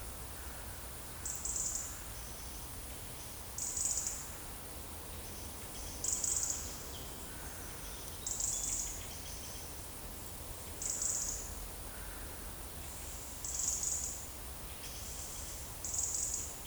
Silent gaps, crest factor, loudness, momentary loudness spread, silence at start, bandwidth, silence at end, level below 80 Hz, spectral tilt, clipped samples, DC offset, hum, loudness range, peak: none; 22 dB; -39 LUFS; 11 LU; 0 s; over 20 kHz; 0 s; -52 dBFS; -1.5 dB/octave; under 0.1%; under 0.1%; none; 3 LU; -18 dBFS